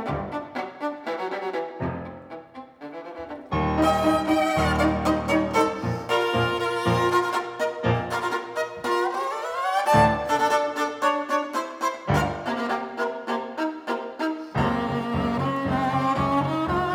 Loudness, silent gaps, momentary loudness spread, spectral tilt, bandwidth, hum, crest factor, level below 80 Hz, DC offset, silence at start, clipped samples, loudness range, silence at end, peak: -25 LUFS; none; 10 LU; -6 dB/octave; over 20 kHz; none; 18 dB; -46 dBFS; under 0.1%; 0 s; under 0.1%; 5 LU; 0 s; -6 dBFS